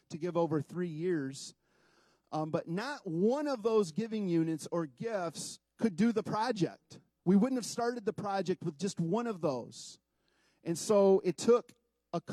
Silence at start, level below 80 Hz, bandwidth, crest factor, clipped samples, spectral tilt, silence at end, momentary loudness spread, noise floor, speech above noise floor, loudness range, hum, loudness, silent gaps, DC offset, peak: 0.1 s; -80 dBFS; 13.5 kHz; 18 dB; under 0.1%; -6 dB/octave; 0 s; 13 LU; -74 dBFS; 42 dB; 4 LU; none; -33 LUFS; none; under 0.1%; -16 dBFS